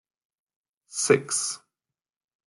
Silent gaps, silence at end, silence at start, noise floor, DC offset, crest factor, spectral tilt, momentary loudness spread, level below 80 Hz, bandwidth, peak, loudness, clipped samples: none; 0.9 s; 0.9 s; under -90 dBFS; under 0.1%; 24 dB; -3 dB/octave; 14 LU; -76 dBFS; 12 kHz; -6 dBFS; -24 LUFS; under 0.1%